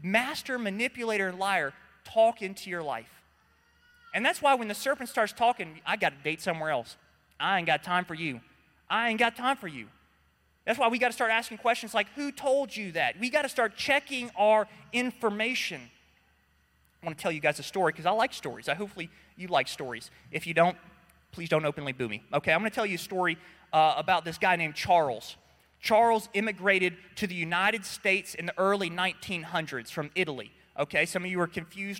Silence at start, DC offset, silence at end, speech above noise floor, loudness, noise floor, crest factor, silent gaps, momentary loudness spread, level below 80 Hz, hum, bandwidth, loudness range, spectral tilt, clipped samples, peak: 0 s; under 0.1%; 0 s; 39 dB; -28 LUFS; -68 dBFS; 20 dB; none; 11 LU; -68 dBFS; none; 16.5 kHz; 4 LU; -4 dB/octave; under 0.1%; -10 dBFS